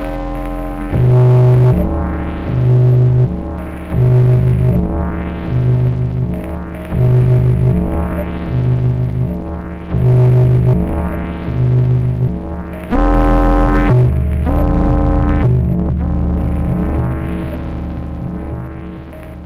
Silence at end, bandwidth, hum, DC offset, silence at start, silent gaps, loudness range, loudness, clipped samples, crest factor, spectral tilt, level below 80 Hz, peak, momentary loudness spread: 0 s; 4 kHz; none; under 0.1%; 0 s; none; 3 LU; -15 LUFS; under 0.1%; 8 dB; -10 dB/octave; -20 dBFS; -4 dBFS; 13 LU